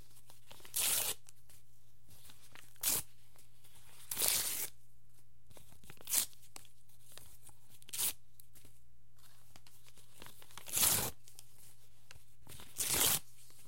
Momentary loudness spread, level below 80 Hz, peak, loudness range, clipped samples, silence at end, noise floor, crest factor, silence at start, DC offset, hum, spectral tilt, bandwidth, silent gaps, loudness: 27 LU; -68 dBFS; -10 dBFS; 9 LU; under 0.1%; 0.45 s; -68 dBFS; 32 dB; 0.5 s; 0.6%; none; 0 dB/octave; 16.5 kHz; none; -34 LUFS